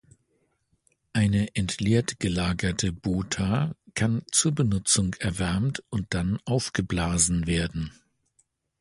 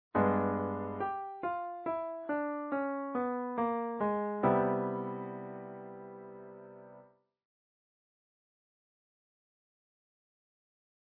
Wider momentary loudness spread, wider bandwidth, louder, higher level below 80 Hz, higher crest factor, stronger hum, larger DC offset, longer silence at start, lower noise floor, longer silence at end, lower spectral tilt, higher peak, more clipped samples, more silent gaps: second, 7 LU vs 19 LU; first, 11.5 kHz vs 4.3 kHz; first, -26 LUFS vs -34 LUFS; first, -42 dBFS vs -72 dBFS; about the same, 20 dB vs 20 dB; neither; neither; first, 1.15 s vs 0.15 s; first, -72 dBFS vs -61 dBFS; second, 0.9 s vs 3.95 s; second, -4.5 dB/octave vs -7.5 dB/octave; first, -8 dBFS vs -16 dBFS; neither; neither